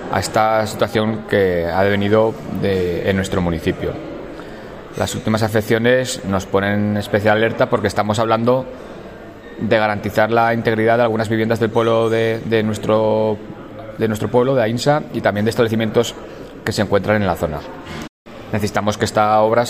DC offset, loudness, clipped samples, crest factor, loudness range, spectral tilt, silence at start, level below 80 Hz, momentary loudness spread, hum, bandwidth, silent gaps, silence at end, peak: under 0.1%; -17 LUFS; under 0.1%; 16 dB; 4 LU; -6 dB/octave; 0 s; -44 dBFS; 16 LU; none; 16 kHz; 18.09-18.25 s; 0 s; -2 dBFS